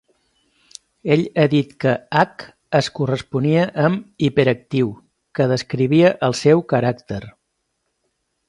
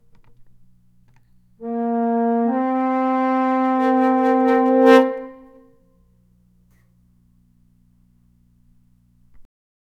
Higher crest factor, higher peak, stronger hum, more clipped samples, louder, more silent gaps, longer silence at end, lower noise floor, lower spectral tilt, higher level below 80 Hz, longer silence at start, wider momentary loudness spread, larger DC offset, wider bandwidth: about the same, 20 dB vs 20 dB; about the same, 0 dBFS vs -2 dBFS; neither; neither; about the same, -18 LUFS vs -18 LUFS; neither; first, 1.2 s vs 0.55 s; first, -73 dBFS vs -57 dBFS; about the same, -6.5 dB/octave vs -6 dB/octave; about the same, -56 dBFS vs -60 dBFS; second, 1.05 s vs 1.6 s; second, 8 LU vs 13 LU; neither; first, 11.5 kHz vs 8 kHz